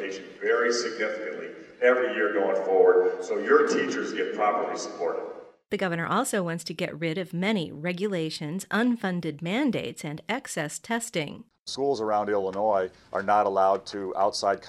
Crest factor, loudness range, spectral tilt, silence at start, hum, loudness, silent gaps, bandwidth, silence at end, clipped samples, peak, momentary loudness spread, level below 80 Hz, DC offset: 20 dB; 5 LU; -4.5 dB/octave; 0 s; none; -26 LUFS; 11.59-11.66 s; 13.5 kHz; 0 s; under 0.1%; -8 dBFS; 11 LU; -70 dBFS; under 0.1%